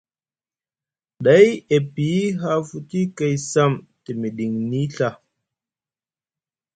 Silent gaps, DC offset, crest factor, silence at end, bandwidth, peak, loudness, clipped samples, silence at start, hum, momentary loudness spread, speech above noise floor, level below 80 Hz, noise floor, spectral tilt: none; under 0.1%; 20 dB; 1.6 s; 9.2 kHz; 0 dBFS; -20 LUFS; under 0.1%; 1.2 s; none; 14 LU; over 71 dB; -60 dBFS; under -90 dBFS; -6 dB/octave